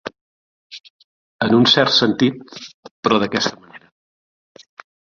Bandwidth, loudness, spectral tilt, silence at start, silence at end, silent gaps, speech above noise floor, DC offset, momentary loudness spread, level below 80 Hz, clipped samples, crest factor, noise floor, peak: 7.4 kHz; -16 LUFS; -4.5 dB/octave; 0.05 s; 1.25 s; 0.21-0.70 s, 0.80-0.84 s, 0.90-1.39 s, 2.74-2.83 s, 2.91-3.03 s; over 73 dB; under 0.1%; 26 LU; -58 dBFS; under 0.1%; 20 dB; under -90 dBFS; -2 dBFS